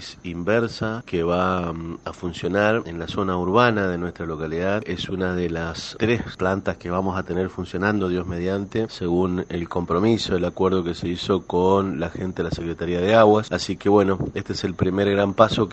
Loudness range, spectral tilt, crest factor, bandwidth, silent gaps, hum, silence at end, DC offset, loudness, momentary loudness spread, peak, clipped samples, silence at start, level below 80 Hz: 4 LU; -6.5 dB/octave; 22 dB; 8.6 kHz; none; none; 0 s; under 0.1%; -23 LUFS; 10 LU; 0 dBFS; under 0.1%; 0 s; -46 dBFS